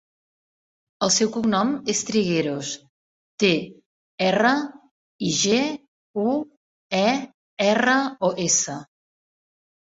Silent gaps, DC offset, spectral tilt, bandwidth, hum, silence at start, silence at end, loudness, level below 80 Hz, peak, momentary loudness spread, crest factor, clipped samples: 2.89-3.38 s, 3.86-4.18 s, 4.91-5.19 s, 5.88-6.14 s, 6.57-6.90 s, 7.34-7.57 s; under 0.1%; -3 dB/octave; 8.4 kHz; none; 1 s; 1.15 s; -22 LUFS; -64 dBFS; -4 dBFS; 14 LU; 20 dB; under 0.1%